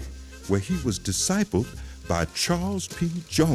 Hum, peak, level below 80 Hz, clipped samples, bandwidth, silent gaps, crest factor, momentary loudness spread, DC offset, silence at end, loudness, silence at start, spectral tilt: none; -8 dBFS; -42 dBFS; under 0.1%; 16 kHz; none; 18 dB; 10 LU; under 0.1%; 0 s; -26 LUFS; 0 s; -4.5 dB/octave